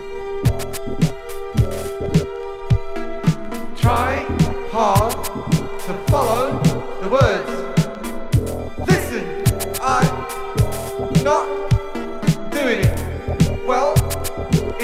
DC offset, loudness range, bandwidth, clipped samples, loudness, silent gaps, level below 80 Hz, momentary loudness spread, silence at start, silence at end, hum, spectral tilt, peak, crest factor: under 0.1%; 2 LU; 16.5 kHz; under 0.1%; -20 LUFS; none; -30 dBFS; 9 LU; 0 s; 0 s; none; -6 dB/octave; -2 dBFS; 18 dB